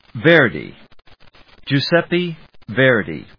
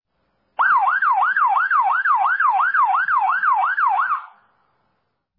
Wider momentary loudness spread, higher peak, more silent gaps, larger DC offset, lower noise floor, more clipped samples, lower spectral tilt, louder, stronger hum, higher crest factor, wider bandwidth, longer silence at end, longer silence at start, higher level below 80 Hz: first, 22 LU vs 4 LU; first, 0 dBFS vs -8 dBFS; neither; first, 0.3% vs under 0.1%; second, -46 dBFS vs -71 dBFS; neither; first, -7.5 dB/octave vs -3 dB/octave; about the same, -16 LUFS vs -17 LUFS; neither; first, 18 dB vs 12 dB; about the same, 5.4 kHz vs 5 kHz; second, 0.2 s vs 1.1 s; second, 0.15 s vs 0.6 s; first, -54 dBFS vs -86 dBFS